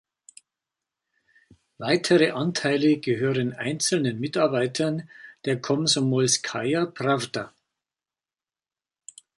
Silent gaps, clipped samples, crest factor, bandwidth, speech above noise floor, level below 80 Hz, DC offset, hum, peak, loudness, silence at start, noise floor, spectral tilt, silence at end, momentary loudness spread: none; under 0.1%; 20 dB; 11.5 kHz; over 66 dB; -68 dBFS; under 0.1%; none; -6 dBFS; -24 LUFS; 1.8 s; under -90 dBFS; -4 dB/octave; 1.9 s; 11 LU